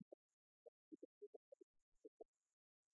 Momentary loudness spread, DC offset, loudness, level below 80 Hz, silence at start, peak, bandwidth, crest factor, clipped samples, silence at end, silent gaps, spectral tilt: 5 LU; under 0.1%; -66 LUFS; under -90 dBFS; 0 s; -46 dBFS; 7.2 kHz; 20 dB; under 0.1%; 0.7 s; 0.02-0.91 s, 1.05-1.21 s, 1.27-1.52 s, 1.63-1.74 s, 1.82-1.92 s, 2.08-2.20 s; -8 dB/octave